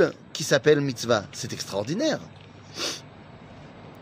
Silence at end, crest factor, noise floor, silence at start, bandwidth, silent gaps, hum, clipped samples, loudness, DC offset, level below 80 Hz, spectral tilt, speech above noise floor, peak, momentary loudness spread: 0 s; 22 dB; -46 dBFS; 0 s; 15.5 kHz; none; none; under 0.1%; -26 LUFS; under 0.1%; -64 dBFS; -4 dB/octave; 21 dB; -4 dBFS; 24 LU